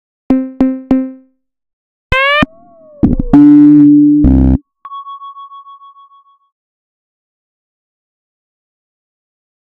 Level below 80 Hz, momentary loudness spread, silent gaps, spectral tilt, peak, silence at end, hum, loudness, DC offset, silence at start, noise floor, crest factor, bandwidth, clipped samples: -24 dBFS; 24 LU; 1.73-2.10 s; -8.5 dB/octave; 0 dBFS; 4.1 s; none; -9 LUFS; under 0.1%; 0.3 s; -46 dBFS; 12 dB; 4.7 kHz; 0.6%